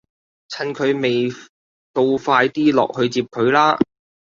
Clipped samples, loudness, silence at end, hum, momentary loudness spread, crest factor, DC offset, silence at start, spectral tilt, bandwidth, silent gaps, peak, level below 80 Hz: under 0.1%; -18 LUFS; 0.45 s; none; 12 LU; 18 dB; under 0.1%; 0.5 s; -5.5 dB/octave; 7.6 kHz; 1.49-1.94 s; -2 dBFS; -60 dBFS